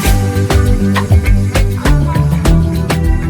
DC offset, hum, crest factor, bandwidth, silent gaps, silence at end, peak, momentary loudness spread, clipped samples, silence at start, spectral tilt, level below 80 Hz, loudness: under 0.1%; none; 10 dB; 19.5 kHz; none; 0 s; 0 dBFS; 3 LU; 0.1%; 0 s; -6.5 dB/octave; -14 dBFS; -12 LUFS